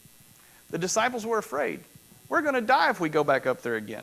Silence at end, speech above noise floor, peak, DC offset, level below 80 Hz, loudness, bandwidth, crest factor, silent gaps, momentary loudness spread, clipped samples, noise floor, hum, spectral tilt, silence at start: 0 s; 29 dB; -8 dBFS; under 0.1%; -68 dBFS; -26 LUFS; 16 kHz; 18 dB; none; 10 LU; under 0.1%; -55 dBFS; none; -3.5 dB/octave; 0.7 s